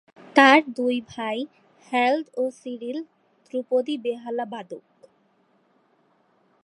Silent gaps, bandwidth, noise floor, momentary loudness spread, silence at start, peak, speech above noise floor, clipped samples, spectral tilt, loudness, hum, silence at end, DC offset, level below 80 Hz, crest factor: none; 11.5 kHz; -64 dBFS; 20 LU; 0.35 s; 0 dBFS; 41 dB; under 0.1%; -3.5 dB/octave; -23 LUFS; none; 1.85 s; under 0.1%; -76 dBFS; 24 dB